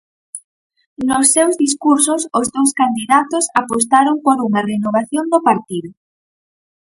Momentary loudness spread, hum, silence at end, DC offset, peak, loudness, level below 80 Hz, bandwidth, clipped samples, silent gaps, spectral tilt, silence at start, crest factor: 13 LU; none; 1.05 s; under 0.1%; 0 dBFS; -15 LUFS; -58 dBFS; 12 kHz; under 0.1%; 0.44-0.70 s, 0.87-0.96 s; -3 dB/octave; 0.35 s; 16 dB